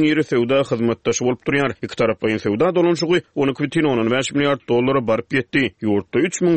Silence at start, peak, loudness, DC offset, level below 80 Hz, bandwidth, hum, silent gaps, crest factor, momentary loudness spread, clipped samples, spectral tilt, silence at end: 0 s; -6 dBFS; -19 LUFS; 0.2%; -54 dBFS; 8.8 kHz; none; none; 14 dB; 4 LU; under 0.1%; -5 dB/octave; 0 s